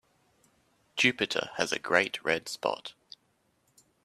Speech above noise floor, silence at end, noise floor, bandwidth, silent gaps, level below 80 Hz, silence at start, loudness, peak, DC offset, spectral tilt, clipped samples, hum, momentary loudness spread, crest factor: 42 dB; 1.15 s; -72 dBFS; 14 kHz; none; -72 dBFS; 0.95 s; -29 LUFS; -6 dBFS; under 0.1%; -2.5 dB/octave; under 0.1%; none; 13 LU; 26 dB